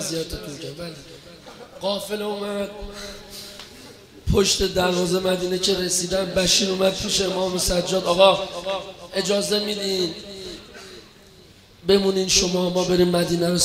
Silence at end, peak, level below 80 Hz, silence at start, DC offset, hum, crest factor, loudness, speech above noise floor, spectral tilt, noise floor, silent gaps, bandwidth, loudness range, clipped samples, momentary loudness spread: 0 s; 0 dBFS; -42 dBFS; 0 s; under 0.1%; none; 22 dB; -21 LUFS; 27 dB; -3.5 dB/octave; -49 dBFS; none; 16 kHz; 11 LU; under 0.1%; 19 LU